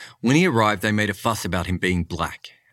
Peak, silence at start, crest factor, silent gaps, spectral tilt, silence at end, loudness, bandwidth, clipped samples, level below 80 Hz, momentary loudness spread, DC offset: -4 dBFS; 0 s; 18 dB; none; -5 dB/octave; 0.25 s; -21 LUFS; 16.5 kHz; under 0.1%; -44 dBFS; 10 LU; under 0.1%